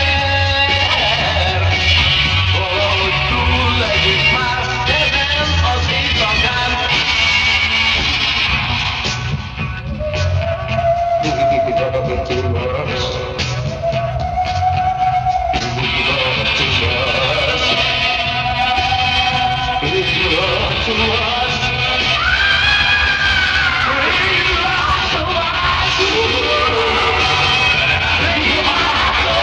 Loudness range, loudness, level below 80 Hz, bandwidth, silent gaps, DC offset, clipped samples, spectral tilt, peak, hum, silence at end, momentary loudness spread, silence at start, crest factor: 5 LU; -14 LUFS; -28 dBFS; 9.2 kHz; none; under 0.1%; under 0.1%; -4 dB/octave; -2 dBFS; none; 0 s; 7 LU; 0 s; 14 dB